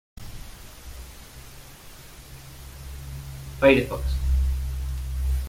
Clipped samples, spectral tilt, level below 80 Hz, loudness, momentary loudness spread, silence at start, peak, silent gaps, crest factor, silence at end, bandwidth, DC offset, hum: under 0.1%; -6 dB/octave; -30 dBFS; -25 LUFS; 25 LU; 0.15 s; -4 dBFS; none; 24 dB; 0 s; 16.5 kHz; under 0.1%; none